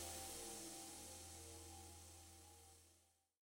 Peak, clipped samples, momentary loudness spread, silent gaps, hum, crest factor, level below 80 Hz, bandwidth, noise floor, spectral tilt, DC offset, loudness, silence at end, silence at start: -38 dBFS; under 0.1%; 13 LU; none; none; 18 dB; -70 dBFS; 16.5 kHz; -77 dBFS; -2 dB/octave; under 0.1%; -54 LUFS; 0.35 s; 0 s